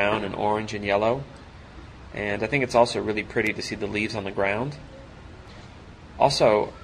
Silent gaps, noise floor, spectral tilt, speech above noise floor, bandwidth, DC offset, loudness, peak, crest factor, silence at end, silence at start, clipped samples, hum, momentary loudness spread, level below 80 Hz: none; -44 dBFS; -5 dB/octave; 20 dB; 13 kHz; under 0.1%; -24 LUFS; -4 dBFS; 20 dB; 0 s; 0 s; under 0.1%; none; 24 LU; -48 dBFS